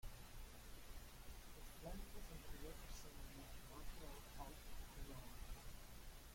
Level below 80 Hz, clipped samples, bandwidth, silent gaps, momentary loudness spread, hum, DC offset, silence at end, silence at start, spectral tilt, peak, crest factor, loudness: -56 dBFS; under 0.1%; 16.5 kHz; none; 4 LU; none; under 0.1%; 0 s; 0 s; -4 dB/octave; -38 dBFS; 16 dB; -58 LUFS